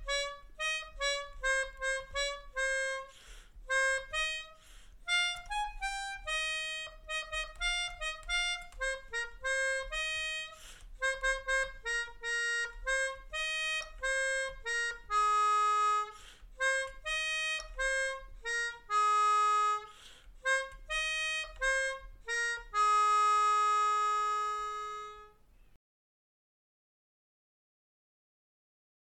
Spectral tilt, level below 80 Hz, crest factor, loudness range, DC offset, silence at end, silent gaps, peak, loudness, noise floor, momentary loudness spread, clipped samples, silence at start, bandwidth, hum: 1 dB/octave; -52 dBFS; 14 dB; 5 LU; under 0.1%; 3.75 s; none; -22 dBFS; -32 LUFS; -60 dBFS; 11 LU; under 0.1%; 0 s; 13.5 kHz; none